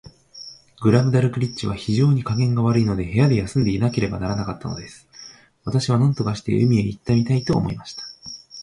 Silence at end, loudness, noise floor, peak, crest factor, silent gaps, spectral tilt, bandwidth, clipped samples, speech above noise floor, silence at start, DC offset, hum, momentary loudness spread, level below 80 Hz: 0 s; -20 LUFS; -45 dBFS; -2 dBFS; 18 dB; none; -7.5 dB/octave; 11 kHz; under 0.1%; 25 dB; 0.05 s; under 0.1%; none; 18 LU; -44 dBFS